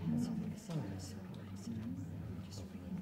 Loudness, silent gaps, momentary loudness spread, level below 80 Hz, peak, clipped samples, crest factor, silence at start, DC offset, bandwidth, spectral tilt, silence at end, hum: -44 LUFS; none; 9 LU; -66 dBFS; -26 dBFS; under 0.1%; 16 dB; 0 s; under 0.1%; 16 kHz; -7 dB/octave; 0 s; none